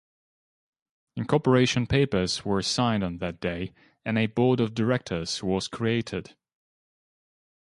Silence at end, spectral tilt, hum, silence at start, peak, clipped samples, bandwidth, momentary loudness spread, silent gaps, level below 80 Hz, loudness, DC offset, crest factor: 1.5 s; -5.5 dB/octave; none; 1.15 s; -6 dBFS; under 0.1%; 11.5 kHz; 13 LU; none; -50 dBFS; -26 LUFS; under 0.1%; 20 dB